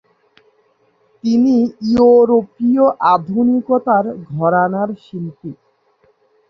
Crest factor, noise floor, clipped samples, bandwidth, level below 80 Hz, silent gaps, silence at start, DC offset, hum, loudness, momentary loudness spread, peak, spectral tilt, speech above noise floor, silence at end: 14 dB; -58 dBFS; under 0.1%; 6.4 kHz; -54 dBFS; none; 1.25 s; under 0.1%; none; -14 LUFS; 16 LU; -2 dBFS; -8.5 dB/octave; 44 dB; 0.95 s